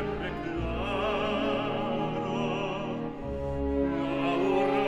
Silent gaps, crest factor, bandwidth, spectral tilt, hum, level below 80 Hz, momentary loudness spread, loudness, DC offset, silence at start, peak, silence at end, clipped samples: none; 16 dB; 10.5 kHz; -7 dB/octave; none; -42 dBFS; 7 LU; -30 LUFS; under 0.1%; 0 s; -14 dBFS; 0 s; under 0.1%